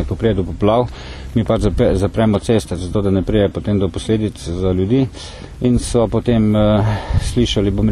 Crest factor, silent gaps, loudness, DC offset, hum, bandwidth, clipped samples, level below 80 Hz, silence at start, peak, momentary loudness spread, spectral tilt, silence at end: 14 dB; none; -17 LUFS; under 0.1%; none; 12.5 kHz; under 0.1%; -28 dBFS; 0 s; -2 dBFS; 7 LU; -7 dB/octave; 0 s